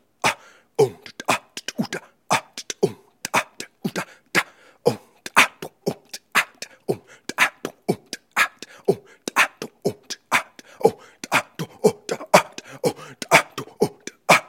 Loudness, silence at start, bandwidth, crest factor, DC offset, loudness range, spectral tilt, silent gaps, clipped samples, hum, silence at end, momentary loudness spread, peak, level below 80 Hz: -23 LUFS; 0.25 s; 17 kHz; 24 dB; under 0.1%; 4 LU; -3 dB/octave; none; under 0.1%; none; 0.05 s; 16 LU; 0 dBFS; -68 dBFS